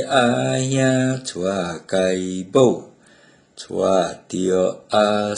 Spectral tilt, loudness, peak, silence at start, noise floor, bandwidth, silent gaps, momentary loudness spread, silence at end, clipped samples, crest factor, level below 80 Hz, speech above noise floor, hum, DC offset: -5 dB/octave; -20 LUFS; -2 dBFS; 0 s; -52 dBFS; 11 kHz; none; 8 LU; 0 s; under 0.1%; 18 dB; -58 dBFS; 33 dB; none; under 0.1%